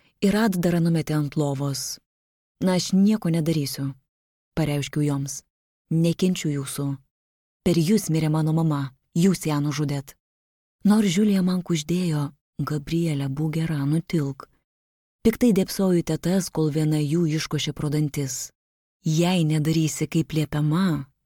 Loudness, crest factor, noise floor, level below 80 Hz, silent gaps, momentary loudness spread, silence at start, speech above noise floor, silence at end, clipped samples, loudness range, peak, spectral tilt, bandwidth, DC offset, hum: -24 LUFS; 16 dB; under -90 dBFS; -52 dBFS; 2.06-2.55 s, 4.09-4.52 s, 5.50-5.85 s, 7.11-7.60 s, 10.20-10.79 s, 12.41-12.53 s, 14.64-15.19 s, 18.55-19.00 s; 9 LU; 0.2 s; over 68 dB; 0.2 s; under 0.1%; 3 LU; -6 dBFS; -6 dB/octave; 17.5 kHz; under 0.1%; none